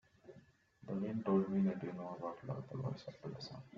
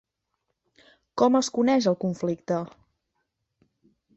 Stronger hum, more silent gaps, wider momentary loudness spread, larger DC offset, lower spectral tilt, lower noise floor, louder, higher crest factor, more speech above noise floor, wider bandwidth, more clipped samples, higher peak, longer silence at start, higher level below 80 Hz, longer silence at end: neither; neither; first, 23 LU vs 10 LU; neither; first, -8 dB/octave vs -5.5 dB/octave; second, -66 dBFS vs -79 dBFS; second, -41 LUFS vs -24 LUFS; about the same, 20 dB vs 20 dB; second, 26 dB vs 56 dB; second, 7 kHz vs 8.2 kHz; neither; second, -22 dBFS vs -8 dBFS; second, 0.25 s vs 1.15 s; second, -76 dBFS vs -68 dBFS; second, 0 s vs 1.5 s